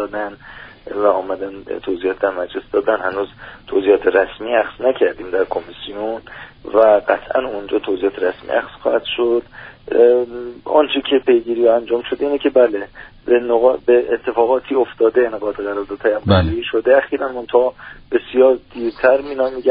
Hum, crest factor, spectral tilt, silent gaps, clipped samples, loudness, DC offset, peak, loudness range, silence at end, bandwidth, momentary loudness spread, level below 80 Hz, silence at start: none; 16 dB; -4 dB/octave; none; under 0.1%; -17 LUFS; under 0.1%; 0 dBFS; 3 LU; 0 s; 5 kHz; 13 LU; -44 dBFS; 0 s